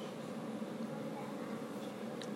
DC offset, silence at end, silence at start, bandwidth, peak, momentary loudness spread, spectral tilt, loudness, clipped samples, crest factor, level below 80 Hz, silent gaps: under 0.1%; 0 s; 0 s; 16 kHz; -28 dBFS; 2 LU; -6 dB/octave; -44 LUFS; under 0.1%; 14 dB; -86 dBFS; none